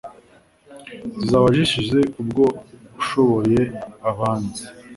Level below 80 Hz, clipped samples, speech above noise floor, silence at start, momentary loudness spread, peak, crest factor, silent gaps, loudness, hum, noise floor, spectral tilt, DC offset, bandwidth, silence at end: -48 dBFS; under 0.1%; 33 dB; 0.05 s; 17 LU; -4 dBFS; 18 dB; none; -20 LUFS; none; -53 dBFS; -6 dB/octave; under 0.1%; 11.5 kHz; 0 s